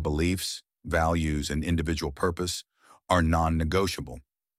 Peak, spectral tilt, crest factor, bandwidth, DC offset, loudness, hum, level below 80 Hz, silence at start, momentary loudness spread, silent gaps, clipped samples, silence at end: -8 dBFS; -5 dB/octave; 20 dB; 16 kHz; under 0.1%; -28 LUFS; none; -38 dBFS; 0 s; 11 LU; none; under 0.1%; 0.4 s